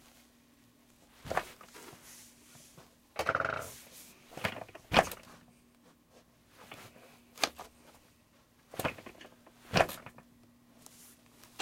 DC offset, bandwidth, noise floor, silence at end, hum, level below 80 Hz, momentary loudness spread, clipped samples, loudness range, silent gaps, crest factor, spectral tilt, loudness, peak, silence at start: under 0.1%; 16.5 kHz; -65 dBFS; 0.15 s; none; -62 dBFS; 26 LU; under 0.1%; 8 LU; none; 32 dB; -3.5 dB/octave; -34 LUFS; -8 dBFS; 1.25 s